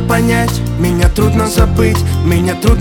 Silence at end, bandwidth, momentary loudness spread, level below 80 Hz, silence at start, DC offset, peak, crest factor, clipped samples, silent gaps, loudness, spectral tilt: 0 s; 19 kHz; 3 LU; -18 dBFS; 0 s; under 0.1%; 0 dBFS; 10 dB; under 0.1%; none; -12 LUFS; -6 dB/octave